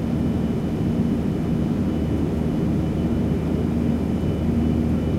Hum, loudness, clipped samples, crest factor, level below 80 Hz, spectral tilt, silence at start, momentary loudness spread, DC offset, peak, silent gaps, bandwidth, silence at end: none; -23 LUFS; under 0.1%; 12 dB; -32 dBFS; -9 dB/octave; 0 s; 2 LU; under 0.1%; -10 dBFS; none; 14 kHz; 0 s